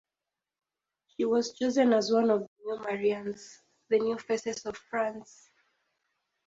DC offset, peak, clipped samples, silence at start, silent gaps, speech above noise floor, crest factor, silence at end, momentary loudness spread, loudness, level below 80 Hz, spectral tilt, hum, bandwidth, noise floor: under 0.1%; -12 dBFS; under 0.1%; 1.2 s; 2.48-2.56 s; over 61 dB; 18 dB; 1.25 s; 13 LU; -29 LUFS; -72 dBFS; -4.5 dB/octave; none; 7.8 kHz; under -90 dBFS